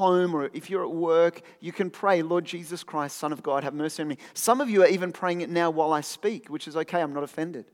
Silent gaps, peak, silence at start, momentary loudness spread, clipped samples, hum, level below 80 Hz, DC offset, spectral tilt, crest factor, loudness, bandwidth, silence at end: none; -6 dBFS; 0 s; 11 LU; under 0.1%; none; -88 dBFS; under 0.1%; -5 dB/octave; 20 dB; -26 LUFS; 18 kHz; 0.1 s